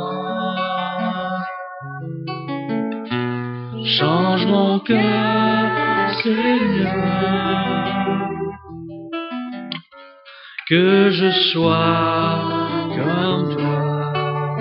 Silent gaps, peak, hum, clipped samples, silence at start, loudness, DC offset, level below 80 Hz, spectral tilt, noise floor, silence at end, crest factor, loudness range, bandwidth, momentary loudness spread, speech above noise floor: none; -2 dBFS; none; under 0.1%; 0 s; -19 LUFS; under 0.1%; -54 dBFS; -9.5 dB/octave; -43 dBFS; 0 s; 18 dB; 7 LU; 5.8 kHz; 14 LU; 26 dB